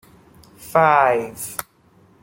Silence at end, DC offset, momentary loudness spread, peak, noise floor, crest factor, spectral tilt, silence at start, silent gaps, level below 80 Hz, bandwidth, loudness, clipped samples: 0.6 s; under 0.1%; 15 LU; -2 dBFS; -54 dBFS; 20 dB; -4.5 dB/octave; 0.6 s; none; -58 dBFS; 17 kHz; -18 LUFS; under 0.1%